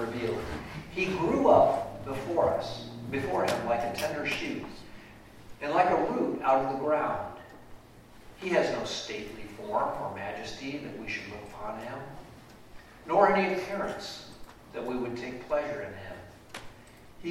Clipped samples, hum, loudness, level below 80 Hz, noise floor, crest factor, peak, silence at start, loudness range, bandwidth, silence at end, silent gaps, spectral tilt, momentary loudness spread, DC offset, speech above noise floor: under 0.1%; none; -30 LUFS; -56 dBFS; -52 dBFS; 22 dB; -8 dBFS; 0 s; 8 LU; 16 kHz; 0 s; none; -5.5 dB/octave; 20 LU; under 0.1%; 23 dB